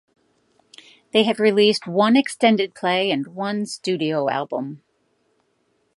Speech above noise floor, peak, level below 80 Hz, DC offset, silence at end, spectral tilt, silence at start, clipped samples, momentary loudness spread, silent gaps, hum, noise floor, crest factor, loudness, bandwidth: 48 dB; -2 dBFS; -74 dBFS; under 0.1%; 1.2 s; -5 dB/octave; 1.15 s; under 0.1%; 9 LU; none; none; -67 dBFS; 20 dB; -20 LUFS; 11.5 kHz